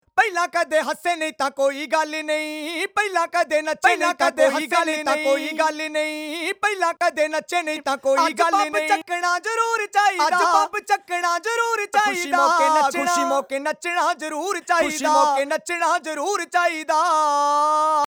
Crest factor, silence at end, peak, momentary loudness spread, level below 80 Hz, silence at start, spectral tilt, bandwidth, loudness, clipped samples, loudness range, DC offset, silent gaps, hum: 18 dB; 0.1 s; -4 dBFS; 6 LU; -68 dBFS; 0.15 s; -0.5 dB/octave; over 20 kHz; -20 LUFS; under 0.1%; 2 LU; under 0.1%; none; none